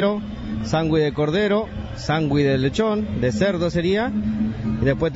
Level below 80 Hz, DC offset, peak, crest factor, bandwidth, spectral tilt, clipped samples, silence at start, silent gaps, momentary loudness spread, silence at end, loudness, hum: -38 dBFS; under 0.1%; -6 dBFS; 14 dB; 8 kHz; -7 dB/octave; under 0.1%; 0 s; none; 6 LU; 0 s; -21 LUFS; none